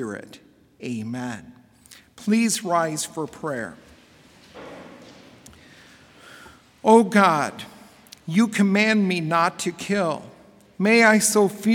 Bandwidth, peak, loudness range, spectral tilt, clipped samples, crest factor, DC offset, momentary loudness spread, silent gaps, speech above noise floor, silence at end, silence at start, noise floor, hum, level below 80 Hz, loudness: 17 kHz; -2 dBFS; 13 LU; -4.5 dB/octave; under 0.1%; 22 dB; under 0.1%; 23 LU; none; 31 dB; 0 s; 0 s; -52 dBFS; none; -66 dBFS; -21 LUFS